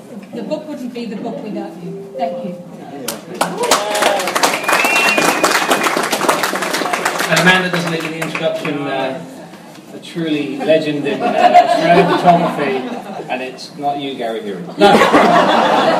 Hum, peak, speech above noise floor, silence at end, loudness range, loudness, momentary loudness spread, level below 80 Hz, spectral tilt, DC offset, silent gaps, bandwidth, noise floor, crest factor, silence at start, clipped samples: none; 0 dBFS; 20 dB; 0 s; 6 LU; -14 LUFS; 17 LU; -58 dBFS; -3.5 dB/octave; under 0.1%; none; 16.5 kHz; -35 dBFS; 16 dB; 0 s; under 0.1%